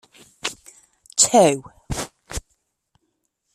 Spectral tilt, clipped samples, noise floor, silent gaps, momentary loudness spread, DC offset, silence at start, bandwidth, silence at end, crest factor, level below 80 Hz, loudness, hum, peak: -3 dB/octave; under 0.1%; -73 dBFS; none; 20 LU; under 0.1%; 0.45 s; 14.5 kHz; 1.15 s; 24 dB; -44 dBFS; -20 LUFS; none; 0 dBFS